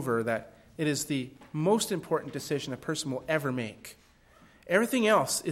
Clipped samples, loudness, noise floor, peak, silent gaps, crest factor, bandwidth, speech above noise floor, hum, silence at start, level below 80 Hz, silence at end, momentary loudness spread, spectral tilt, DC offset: under 0.1%; -30 LUFS; -59 dBFS; -10 dBFS; none; 20 dB; 16 kHz; 30 dB; none; 0 s; -66 dBFS; 0 s; 12 LU; -4.5 dB/octave; under 0.1%